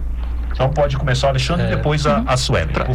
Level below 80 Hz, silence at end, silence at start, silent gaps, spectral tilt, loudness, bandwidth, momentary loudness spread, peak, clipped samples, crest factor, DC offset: -24 dBFS; 0 s; 0 s; none; -5.5 dB/octave; -18 LUFS; 12.5 kHz; 6 LU; -8 dBFS; under 0.1%; 10 dB; under 0.1%